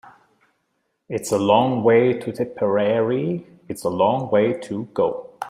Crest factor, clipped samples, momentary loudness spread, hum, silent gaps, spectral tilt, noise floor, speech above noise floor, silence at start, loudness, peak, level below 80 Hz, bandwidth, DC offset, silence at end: 18 dB; under 0.1%; 11 LU; none; none; -6 dB/octave; -72 dBFS; 52 dB; 0.05 s; -21 LUFS; -2 dBFS; -64 dBFS; 15.5 kHz; under 0.1%; 0 s